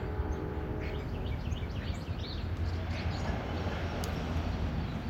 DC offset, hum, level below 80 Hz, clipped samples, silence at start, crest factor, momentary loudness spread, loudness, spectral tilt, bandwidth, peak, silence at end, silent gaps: under 0.1%; none; -40 dBFS; under 0.1%; 0 s; 14 dB; 3 LU; -36 LUFS; -6.5 dB/octave; 15.5 kHz; -20 dBFS; 0 s; none